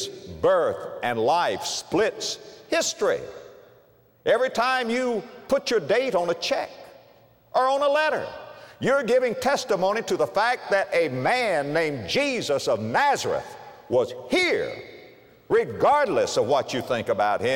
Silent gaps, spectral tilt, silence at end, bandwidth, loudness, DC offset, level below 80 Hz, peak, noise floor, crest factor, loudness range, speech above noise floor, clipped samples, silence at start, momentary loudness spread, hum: none; -3.5 dB/octave; 0 s; 16.5 kHz; -24 LUFS; under 0.1%; -62 dBFS; -10 dBFS; -57 dBFS; 14 dB; 3 LU; 34 dB; under 0.1%; 0 s; 9 LU; none